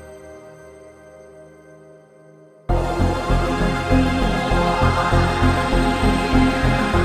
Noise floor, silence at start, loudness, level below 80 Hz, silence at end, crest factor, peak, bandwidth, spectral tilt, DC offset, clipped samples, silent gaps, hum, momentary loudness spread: -47 dBFS; 0 s; -19 LUFS; -26 dBFS; 0 s; 16 dB; -4 dBFS; 13 kHz; -6 dB/octave; under 0.1%; under 0.1%; none; none; 11 LU